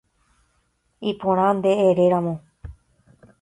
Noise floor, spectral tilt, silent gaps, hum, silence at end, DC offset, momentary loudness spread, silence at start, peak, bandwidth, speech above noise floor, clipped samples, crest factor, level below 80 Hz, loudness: -68 dBFS; -7.5 dB/octave; none; none; 0.7 s; under 0.1%; 12 LU; 1 s; -6 dBFS; 11 kHz; 48 dB; under 0.1%; 16 dB; -52 dBFS; -20 LUFS